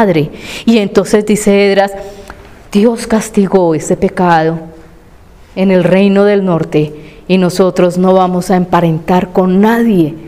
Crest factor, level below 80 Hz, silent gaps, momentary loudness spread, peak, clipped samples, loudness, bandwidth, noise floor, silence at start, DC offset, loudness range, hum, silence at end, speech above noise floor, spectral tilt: 10 dB; -38 dBFS; none; 8 LU; 0 dBFS; 0.2%; -10 LUFS; 15.5 kHz; -38 dBFS; 0 s; 0.4%; 2 LU; none; 0 s; 28 dB; -6.5 dB/octave